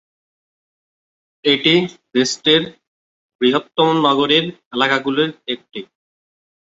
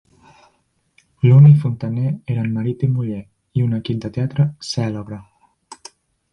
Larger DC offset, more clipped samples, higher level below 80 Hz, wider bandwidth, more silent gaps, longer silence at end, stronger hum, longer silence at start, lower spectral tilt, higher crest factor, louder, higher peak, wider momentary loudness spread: neither; neither; second, -62 dBFS vs -52 dBFS; second, 8 kHz vs 9.2 kHz; first, 2.87-3.39 s, 4.66-4.71 s vs none; first, 0.9 s vs 0.6 s; neither; first, 1.45 s vs 1.25 s; second, -4 dB/octave vs -8 dB/octave; about the same, 18 dB vs 16 dB; about the same, -16 LUFS vs -17 LUFS; about the same, 0 dBFS vs -2 dBFS; second, 13 LU vs 23 LU